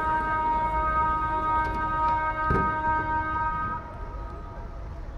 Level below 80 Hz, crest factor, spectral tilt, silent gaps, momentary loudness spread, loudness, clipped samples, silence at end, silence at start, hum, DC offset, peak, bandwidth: -36 dBFS; 16 dB; -7.5 dB/octave; none; 15 LU; -26 LUFS; under 0.1%; 0 s; 0 s; none; under 0.1%; -12 dBFS; 7.2 kHz